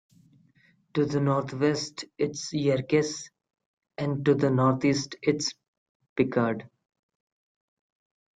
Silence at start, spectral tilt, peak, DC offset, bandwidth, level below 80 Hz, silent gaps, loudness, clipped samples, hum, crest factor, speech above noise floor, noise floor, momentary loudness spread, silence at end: 0.95 s; -5.5 dB/octave; -8 dBFS; under 0.1%; 9.4 kHz; -66 dBFS; 3.66-3.77 s, 5.68-6.00 s, 6.09-6.16 s; -27 LUFS; under 0.1%; none; 20 dB; 38 dB; -64 dBFS; 12 LU; 1.7 s